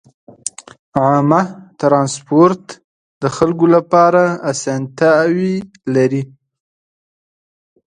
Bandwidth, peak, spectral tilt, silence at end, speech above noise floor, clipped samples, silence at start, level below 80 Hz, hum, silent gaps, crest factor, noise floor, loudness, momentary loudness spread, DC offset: 10.5 kHz; 0 dBFS; -6 dB/octave; 1.7 s; over 77 dB; under 0.1%; 0.45 s; -56 dBFS; none; 0.79-0.92 s, 2.84-3.21 s; 16 dB; under -90 dBFS; -14 LUFS; 13 LU; under 0.1%